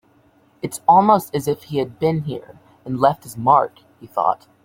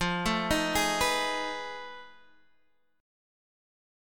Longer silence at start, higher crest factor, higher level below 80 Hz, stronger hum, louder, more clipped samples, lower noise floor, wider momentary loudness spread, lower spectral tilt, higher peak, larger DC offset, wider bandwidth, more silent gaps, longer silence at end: first, 0.65 s vs 0 s; about the same, 20 dB vs 20 dB; second, -58 dBFS vs -48 dBFS; neither; first, -19 LUFS vs -28 LUFS; neither; second, -56 dBFS vs -72 dBFS; about the same, 16 LU vs 16 LU; first, -6.5 dB/octave vs -3 dB/octave; first, 0 dBFS vs -12 dBFS; neither; about the same, 17 kHz vs 17.5 kHz; neither; second, 0.3 s vs 1 s